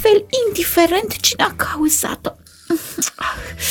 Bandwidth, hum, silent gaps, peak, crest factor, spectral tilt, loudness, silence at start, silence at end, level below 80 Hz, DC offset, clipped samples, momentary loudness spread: 20 kHz; none; none; 0 dBFS; 18 dB; -2 dB/octave; -17 LUFS; 0 s; 0 s; -42 dBFS; under 0.1%; under 0.1%; 9 LU